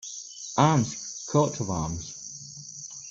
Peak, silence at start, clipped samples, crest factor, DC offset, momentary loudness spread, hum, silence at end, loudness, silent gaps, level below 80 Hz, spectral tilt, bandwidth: -6 dBFS; 0 s; under 0.1%; 22 dB; under 0.1%; 17 LU; none; 0 s; -27 LUFS; none; -54 dBFS; -5 dB/octave; 8 kHz